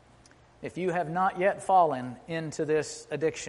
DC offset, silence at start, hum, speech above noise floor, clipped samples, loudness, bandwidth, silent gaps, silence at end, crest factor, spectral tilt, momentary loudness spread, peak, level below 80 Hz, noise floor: under 0.1%; 0.6 s; none; 29 dB; under 0.1%; -28 LUFS; 11.5 kHz; none; 0 s; 18 dB; -5 dB/octave; 12 LU; -12 dBFS; -64 dBFS; -57 dBFS